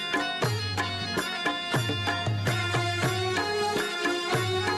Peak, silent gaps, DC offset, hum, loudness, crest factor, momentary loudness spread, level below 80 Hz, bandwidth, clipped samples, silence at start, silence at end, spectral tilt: -16 dBFS; none; under 0.1%; none; -27 LUFS; 12 dB; 2 LU; -58 dBFS; 15 kHz; under 0.1%; 0 s; 0 s; -4 dB/octave